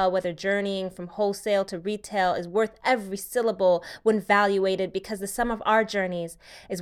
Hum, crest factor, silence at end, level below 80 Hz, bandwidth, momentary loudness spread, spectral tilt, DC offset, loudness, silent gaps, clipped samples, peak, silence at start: none; 18 dB; 0 s; -56 dBFS; 16.5 kHz; 10 LU; -4.5 dB/octave; under 0.1%; -26 LUFS; none; under 0.1%; -8 dBFS; 0 s